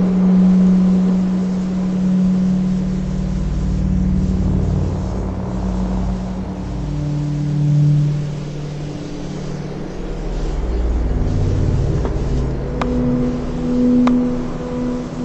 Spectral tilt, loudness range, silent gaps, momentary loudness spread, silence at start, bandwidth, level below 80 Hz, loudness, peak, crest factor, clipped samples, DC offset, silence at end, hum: -8.5 dB/octave; 5 LU; none; 12 LU; 0 s; 8 kHz; -24 dBFS; -19 LUFS; -2 dBFS; 16 dB; under 0.1%; under 0.1%; 0 s; none